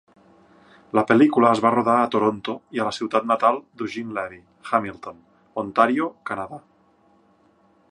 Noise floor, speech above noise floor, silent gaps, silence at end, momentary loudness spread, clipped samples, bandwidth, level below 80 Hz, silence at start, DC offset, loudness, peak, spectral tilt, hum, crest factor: -59 dBFS; 38 dB; none; 1.3 s; 18 LU; under 0.1%; 10.5 kHz; -64 dBFS; 0.95 s; under 0.1%; -21 LUFS; -2 dBFS; -6 dB/octave; none; 22 dB